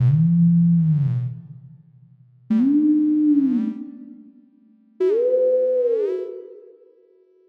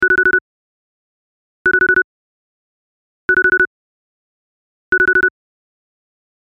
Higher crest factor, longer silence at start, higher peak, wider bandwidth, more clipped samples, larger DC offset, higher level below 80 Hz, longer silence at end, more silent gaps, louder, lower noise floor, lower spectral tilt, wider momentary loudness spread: about the same, 10 dB vs 14 dB; about the same, 0 s vs 0 s; second, -10 dBFS vs -4 dBFS; second, 3.5 kHz vs 6 kHz; neither; neither; second, -62 dBFS vs -48 dBFS; second, 0.9 s vs 1.25 s; second, none vs 0.41-1.65 s, 2.04-3.28 s, 3.67-4.92 s; second, -19 LUFS vs -14 LUFS; second, -56 dBFS vs under -90 dBFS; first, -12.5 dB/octave vs -6 dB/octave; first, 18 LU vs 7 LU